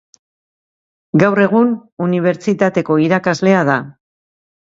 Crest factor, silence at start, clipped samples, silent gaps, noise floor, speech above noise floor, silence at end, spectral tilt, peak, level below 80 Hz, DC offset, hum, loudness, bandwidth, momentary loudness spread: 16 dB; 1.15 s; under 0.1%; 1.92-1.97 s; under -90 dBFS; over 76 dB; 0.85 s; -7 dB/octave; 0 dBFS; -58 dBFS; under 0.1%; none; -15 LUFS; 7.8 kHz; 6 LU